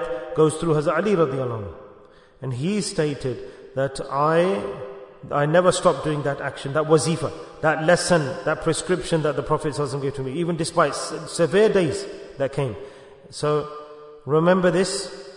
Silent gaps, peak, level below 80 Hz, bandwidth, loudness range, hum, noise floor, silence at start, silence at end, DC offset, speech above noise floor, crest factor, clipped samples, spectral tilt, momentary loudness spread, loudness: none; -4 dBFS; -50 dBFS; 11 kHz; 4 LU; none; -49 dBFS; 0 s; 0 s; under 0.1%; 27 dB; 20 dB; under 0.1%; -5.5 dB/octave; 15 LU; -22 LUFS